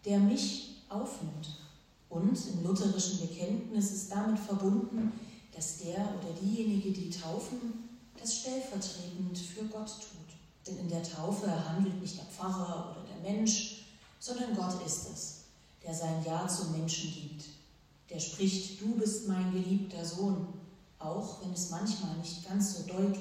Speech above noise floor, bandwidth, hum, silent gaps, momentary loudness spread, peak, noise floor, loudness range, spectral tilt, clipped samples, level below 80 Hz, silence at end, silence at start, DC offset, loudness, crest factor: 27 dB; 15 kHz; none; none; 13 LU; -16 dBFS; -62 dBFS; 5 LU; -5 dB/octave; under 0.1%; -66 dBFS; 0 s; 0.05 s; under 0.1%; -35 LUFS; 20 dB